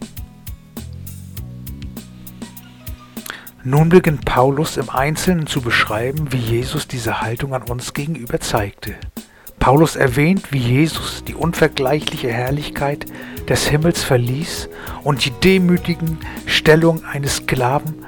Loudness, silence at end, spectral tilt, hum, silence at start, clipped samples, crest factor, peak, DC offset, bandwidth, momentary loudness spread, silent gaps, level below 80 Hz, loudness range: -17 LUFS; 0 s; -5.5 dB/octave; none; 0 s; under 0.1%; 18 dB; 0 dBFS; under 0.1%; 19 kHz; 20 LU; none; -36 dBFS; 6 LU